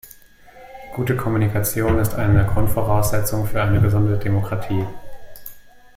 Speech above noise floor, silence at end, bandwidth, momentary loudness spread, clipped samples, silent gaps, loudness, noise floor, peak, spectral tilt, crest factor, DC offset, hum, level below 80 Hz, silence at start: 28 dB; 0.3 s; 16.5 kHz; 17 LU; under 0.1%; none; -20 LUFS; -46 dBFS; -4 dBFS; -6.5 dB/octave; 14 dB; under 0.1%; none; -32 dBFS; 0.05 s